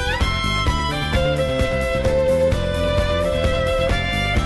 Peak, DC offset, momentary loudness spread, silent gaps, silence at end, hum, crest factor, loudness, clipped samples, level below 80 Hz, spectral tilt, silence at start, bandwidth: -8 dBFS; under 0.1%; 2 LU; none; 0 s; none; 12 dB; -20 LUFS; under 0.1%; -26 dBFS; -5.5 dB/octave; 0 s; 12.5 kHz